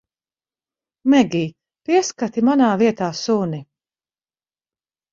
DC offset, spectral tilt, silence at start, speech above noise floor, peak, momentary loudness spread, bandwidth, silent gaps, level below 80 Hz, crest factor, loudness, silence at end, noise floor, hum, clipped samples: under 0.1%; -5.5 dB/octave; 1.05 s; over 73 dB; -2 dBFS; 12 LU; 7.6 kHz; none; -62 dBFS; 18 dB; -19 LUFS; 1.5 s; under -90 dBFS; none; under 0.1%